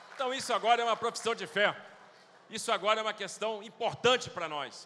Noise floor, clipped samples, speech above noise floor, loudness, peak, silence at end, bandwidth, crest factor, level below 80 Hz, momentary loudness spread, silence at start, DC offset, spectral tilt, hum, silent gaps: -57 dBFS; under 0.1%; 26 dB; -31 LUFS; -12 dBFS; 0 s; 14 kHz; 22 dB; -78 dBFS; 9 LU; 0 s; under 0.1%; -2 dB/octave; none; none